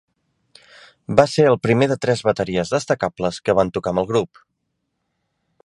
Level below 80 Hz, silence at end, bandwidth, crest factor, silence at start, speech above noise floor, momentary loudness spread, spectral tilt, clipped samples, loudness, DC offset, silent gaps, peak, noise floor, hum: -52 dBFS; 1.4 s; 11.5 kHz; 20 dB; 1.1 s; 56 dB; 7 LU; -6 dB/octave; under 0.1%; -19 LUFS; under 0.1%; none; 0 dBFS; -74 dBFS; none